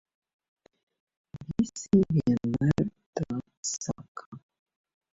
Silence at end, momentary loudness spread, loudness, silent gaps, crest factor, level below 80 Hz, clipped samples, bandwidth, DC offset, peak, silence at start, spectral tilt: 0.75 s; 20 LU; -29 LUFS; 3.06-3.13 s, 3.57-3.63 s, 4.08-4.15 s, 4.26-4.32 s; 20 dB; -54 dBFS; under 0.1%; 8 kHz; under 0.1%; -10 dBFS; 1.35 s; -6.5 dB/octave